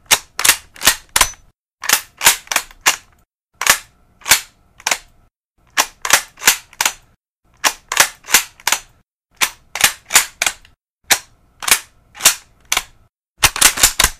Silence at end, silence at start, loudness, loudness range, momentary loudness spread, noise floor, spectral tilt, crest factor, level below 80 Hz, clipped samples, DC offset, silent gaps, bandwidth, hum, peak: 0.05 s; 0.1 s; -15 LUFS; 3 LU; 8 LU; -57 dBFS; 1 dB/octave; 18 dB; -40 dBFS; 0.1%; under 0.1%; 1.55-1.64 s, 1.73-1.77 s, 3.44-3.49 s, 5.36-5.55 s, 7.30-7.42 s, 10.83-10.96 s, 13.19-13.23 s, 13.29-13.35 s; over 20 kHz; none; 0 dBFS